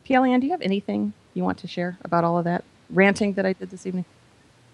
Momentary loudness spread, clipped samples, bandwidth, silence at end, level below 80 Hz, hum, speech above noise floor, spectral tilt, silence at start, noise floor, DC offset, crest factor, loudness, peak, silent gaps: 12 LU; under 0.1%; 11 kHz; 0.7 s; -62 dBFS; none; 33 dB; -6.5 dB/octave; 0.1 s; -55 dBFS; under 0.1%; 20 dB; -24 LUFS; -2 dBFS; none